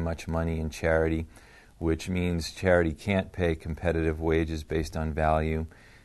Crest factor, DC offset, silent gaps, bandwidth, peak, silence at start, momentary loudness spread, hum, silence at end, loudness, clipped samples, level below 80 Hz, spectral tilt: 20 dB; under 0.1%; none; 12.5 kHz; -8 dBFS; 0 s; 7 LU; none; 0.35 s; -28 LUFS; under 0.1%; -38 dBFS; -6.5 dB/octave